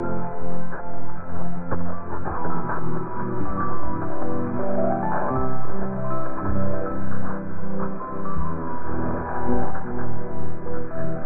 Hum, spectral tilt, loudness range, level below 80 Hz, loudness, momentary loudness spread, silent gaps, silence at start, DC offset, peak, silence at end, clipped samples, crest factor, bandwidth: none; -14 dB/octave; 3 LU; -42 dBFS; -29 LUFS; 8 LU; none; 0 s; under 0.1%; -6 dBFS; 0 s; under 0.1%; 10 dB; 2.6 kHz